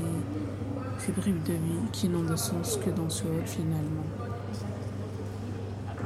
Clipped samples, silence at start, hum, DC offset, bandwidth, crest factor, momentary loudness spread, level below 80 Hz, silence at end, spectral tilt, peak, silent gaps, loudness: under 0.1%; 0 s; none; under 0.1%; 15.5 kHz; 14 dB; 8 LU; -52 dBFS; 0 s; -6 dB/octave; -16 dBFS; none; -32 LUFS